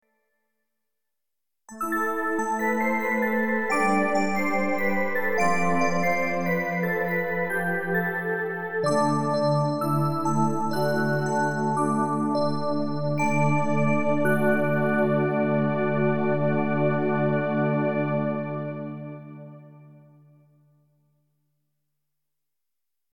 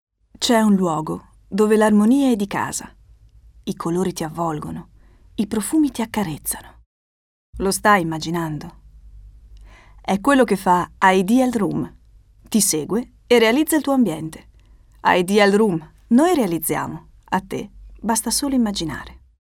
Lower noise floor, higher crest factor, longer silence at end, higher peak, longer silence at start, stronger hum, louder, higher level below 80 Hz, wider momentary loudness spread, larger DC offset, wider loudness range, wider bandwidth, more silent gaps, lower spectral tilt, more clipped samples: first, -87 dBFS vs -49 dBFS; about the same, 16 dB vs 18 dB; second, 0 s vs 0.25 s; second, -10 dBFS vs -2 dBFS; second, 0 s vs 0.4 s; neither; second, -25 LUFS vs -19 LUFS; second, -68 dBFS vs -46 dBFS; second, 5 LU vs 16 LU; neither; about the same, 5 LU vs 6 LU; about the same, 18 kHz vs 18 kHz; second, none vs 6.86-7.53 s; first, -7 dB/octave vs -4.5 dB/octave; neither